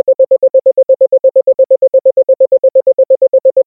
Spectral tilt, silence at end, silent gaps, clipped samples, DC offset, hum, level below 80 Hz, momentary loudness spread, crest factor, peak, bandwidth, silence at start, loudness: -11 dB/octave; 0.05 s; none; under 0.1%; under 0.1%; none; -66 dBFS; 1 LU; 8 dB; -2 dBFS; 1 kHz; 0.05 s; -9 LUFS